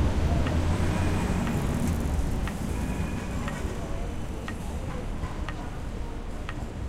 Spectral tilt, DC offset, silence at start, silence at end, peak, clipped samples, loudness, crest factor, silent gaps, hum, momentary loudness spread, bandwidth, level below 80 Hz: -6.5 dB/octave; under 0.1%; 0 s; 0 s; -14 dBFS; under 0.1%; -31 LUFS; 14 dB; none; none; 10 LU; 15.5 kHz; -32 dBFS